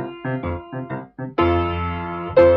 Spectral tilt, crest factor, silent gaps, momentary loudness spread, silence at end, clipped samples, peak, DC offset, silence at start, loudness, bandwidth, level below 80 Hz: -6 dB/octave; 16 dB; none; 11 LU; 0 s; under 0.1%; -4 dBFS; under 0.1%; 0 s; -23 LUFS; 5.2 kHz; -38 dBFS